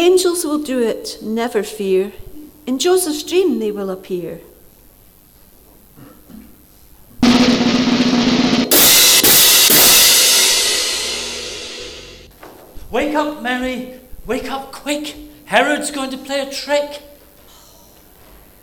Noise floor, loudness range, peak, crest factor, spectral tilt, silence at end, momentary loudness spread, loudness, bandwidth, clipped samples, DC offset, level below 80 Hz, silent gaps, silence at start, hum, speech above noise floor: -47 dBFS; 15 LU; 0 dBFS; 16 dB; -1.5 dB/octave; 1.6 s; 20 LU; -13 LUFS; over 20 kHz; under 0.1%; under 0.1%; -44 dBFS; none; 0 s; none; 28 dB